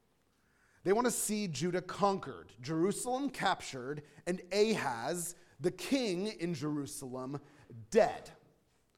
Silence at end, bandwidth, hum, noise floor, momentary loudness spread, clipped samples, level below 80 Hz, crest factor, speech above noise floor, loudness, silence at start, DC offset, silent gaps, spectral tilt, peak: 0.65 s; 16.5 kHz; none; -74 dBFS; 12 LU; under 0.1%; -66 dBFS; 22 dB; 39 dB; -35 LUFS; 0.85 s; under 0.1%; none; -4.5 dB/octave; -14 dBFS